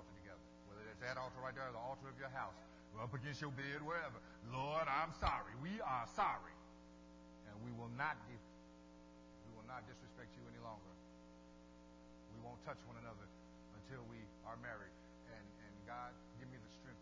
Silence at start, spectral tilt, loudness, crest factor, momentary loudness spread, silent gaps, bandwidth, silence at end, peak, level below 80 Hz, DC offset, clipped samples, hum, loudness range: 0 s; -5.5 dB/octave; -48 LUFS; 26 dB; 21 LU; none; 7.6 kHz; 0 s; -24 dBFS; -64 dBFS; under 0.1%; under 0.1%; 60 Hz at -65 dBFS; 14 LU